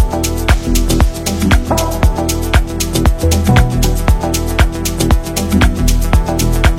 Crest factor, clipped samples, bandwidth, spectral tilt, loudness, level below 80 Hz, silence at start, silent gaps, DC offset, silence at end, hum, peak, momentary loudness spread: 12 dB; under 0.1%; 17 kHz; -5 dB/octave; -14 LUFS; -14 dBFS; 0 s; none; under 0.1%; 0 s; none; 0 dBFS; 4 LU